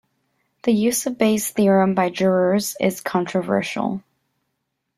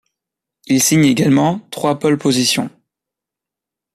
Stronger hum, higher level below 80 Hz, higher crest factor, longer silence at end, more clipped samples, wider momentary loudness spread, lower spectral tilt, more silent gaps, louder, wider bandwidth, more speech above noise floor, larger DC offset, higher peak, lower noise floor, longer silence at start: neither; second, -62 dBFS vs -56 dBFS; about the same, 18 dB vs 16 dB; second, 1 s vs 1.25 s; neither; about the same, 8 LU vs 8 LU; about the same, -5 dB/octave vs -4.5 dB/octave; neither; second, -20 LUFS vs -15 LUFS; about the same, 15.5 kHz vs 14.5 kHz; second, 57 dB vs 71 dB; neither; about the same, -2 dBFS vs -2 dBFS; second, -76 dBFS vs -85 dBFS; about the same, 0.65 s vs 0.7 s